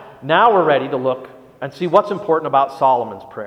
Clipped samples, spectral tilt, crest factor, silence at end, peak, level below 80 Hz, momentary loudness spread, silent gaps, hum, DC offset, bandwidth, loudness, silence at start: under 0.1%; -6.5 dB/octave; 18 dB; 0 s; 0 dBFS; -62 dBFS; 15 LU; none; none; under 0.1%; 11 kHz; -16 LUFS; 0 s